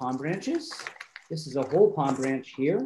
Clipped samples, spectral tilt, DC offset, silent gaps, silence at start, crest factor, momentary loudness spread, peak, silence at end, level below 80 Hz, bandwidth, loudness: under 0.1%; -6 dB/octave; under 0.1%; none; 0 s; 18 dB; 15 LU; -8 dBFS; 0 s; -74 dBFS; 12 kHz; -28 LUFS